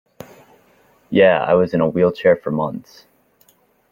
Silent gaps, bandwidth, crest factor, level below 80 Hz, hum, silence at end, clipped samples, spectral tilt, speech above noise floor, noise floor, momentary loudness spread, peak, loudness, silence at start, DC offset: none; 16 kHz; 16 dB; -56 dBFS; none; 1.1 s; under 0.1%; -8 dB/octave; 41 dB; -57 dBFS; 10 LU; -2 dBFS; -17 LUFS; 1.1 s; under 0.1%